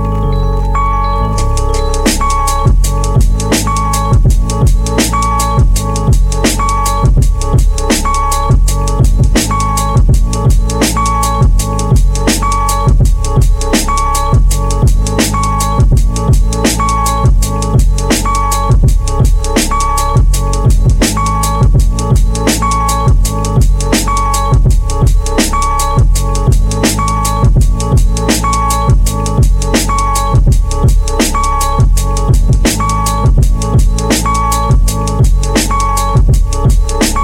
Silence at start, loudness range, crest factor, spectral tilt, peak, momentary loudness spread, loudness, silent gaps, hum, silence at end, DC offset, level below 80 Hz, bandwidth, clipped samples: 0 s; 0 LU; 10 dB; -5 dB/octave; 0 dBFS; 2 LU; -12 LUFS; none; none; 0 s; under 0.1%; -12 dBFS; 16.5 kHz; under 0.1%